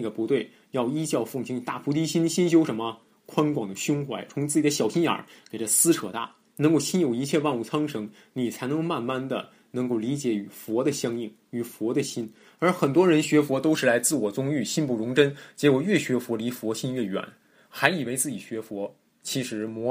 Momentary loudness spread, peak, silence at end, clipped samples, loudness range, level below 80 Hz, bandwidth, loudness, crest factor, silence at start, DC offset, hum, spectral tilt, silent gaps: 13 LU; -2 dBFS; 0 s; under 0.1%; 6 LU; -72 dBFS; 15.5 kHz; -26 LUFS; 24 dB; 0 s; under 0.1%; none; -4.5 dB/octave; none